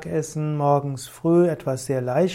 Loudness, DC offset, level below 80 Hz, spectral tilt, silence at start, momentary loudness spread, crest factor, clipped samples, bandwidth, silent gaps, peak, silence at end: -23 LUFS; under 0.1%; -58 dBFS; -7 dB/octave; 0 s; 8 LU; 14 dB; under 0.1%; 16 kHz; none; -8 dBFS; 0 s